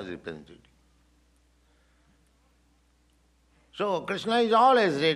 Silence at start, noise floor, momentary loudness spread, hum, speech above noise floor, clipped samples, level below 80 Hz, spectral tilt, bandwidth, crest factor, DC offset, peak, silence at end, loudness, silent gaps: 0 s; -65 dBFS; 23 LU; none; 41 dB; under 0.1%; -66 dBFS; -5 dB/octave; 12 kHz; 20 dB; under 0.1%; -10 dBFS; 0 s; -24 LUFS; none